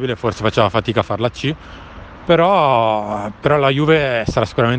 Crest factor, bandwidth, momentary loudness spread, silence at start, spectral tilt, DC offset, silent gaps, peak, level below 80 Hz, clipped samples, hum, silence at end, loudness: 16 dB; 9 kHz; 16 LU; 0 s; -6.5 dB/octave; under 0.1%; none; 0 dBFS; -40 dBFS; under 0.1%; none; 0 s; -16 LUFS